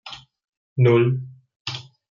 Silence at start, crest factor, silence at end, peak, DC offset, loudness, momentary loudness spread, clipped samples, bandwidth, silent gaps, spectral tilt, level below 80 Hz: 0.05 s; 16 dB; 0.3 s; -6 dBFS; under 0.1%; -21 LUFS; 23 LU; under 0.1%; 7.2 kHz; 0.49-0.76 s, 1.56-1.65 s; -8 dB/octave; -66 dBFS